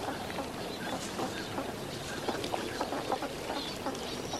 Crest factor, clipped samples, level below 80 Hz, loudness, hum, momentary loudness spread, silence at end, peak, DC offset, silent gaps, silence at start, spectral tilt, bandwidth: 20 dB; under 0.1%; -56 dBFS; -36 LUFS; none; 3 LU; 0 s; -16 dBFS; under 0.1%; none; 0 s; -3.5 dB/octave; 16 kHz